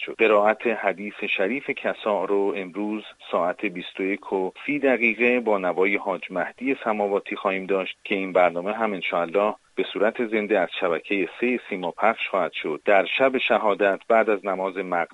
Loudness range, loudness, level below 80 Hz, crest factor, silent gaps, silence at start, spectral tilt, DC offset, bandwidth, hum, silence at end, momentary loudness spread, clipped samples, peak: 4 LU; -24 LUFS; -70 dBFS; 20 dB; none; 0 s; -6 dB/octave; under 0.1%; 10.5 kHz; none; 0.1 s; 8 LU; under 0.1%; -4 dBFS